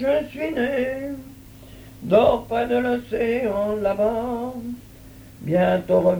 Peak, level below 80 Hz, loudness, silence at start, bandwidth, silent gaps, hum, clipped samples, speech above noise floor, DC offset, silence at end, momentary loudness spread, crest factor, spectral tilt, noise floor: -4 dBFS; -48 dBFS; -22 LUFS; 0 s; over 20 kHz; none; none; under 0.1%; 22 dB; under 0.1%; 0 s; 17 LU; 18 dB; -7 dB/octave; -44 dBFS